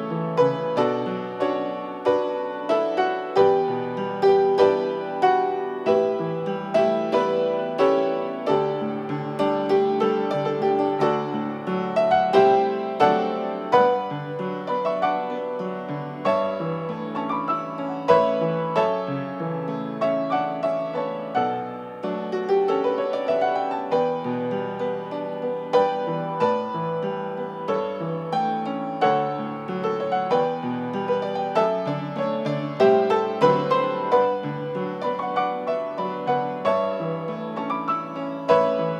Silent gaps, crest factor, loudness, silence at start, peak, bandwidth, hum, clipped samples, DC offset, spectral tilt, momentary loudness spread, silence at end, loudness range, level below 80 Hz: none; 20 dB; -23 LUFS; 0 s; -4 dBFS; 9 kHz; none; under 0.1%; under 0.1%; -7 dB/octave; 9 LU; 0 s; 5 LU; -70 dBFS